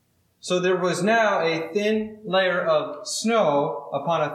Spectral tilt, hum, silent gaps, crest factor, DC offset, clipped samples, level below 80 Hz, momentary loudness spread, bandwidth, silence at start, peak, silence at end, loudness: -4 dB/octave; none; none; 14 dB; under 0.1%; under 0.1%; -72 dBFS; 7 LU; 14 kHz; 0.45 s; -8 dBFS; 0 s; -23 LUFS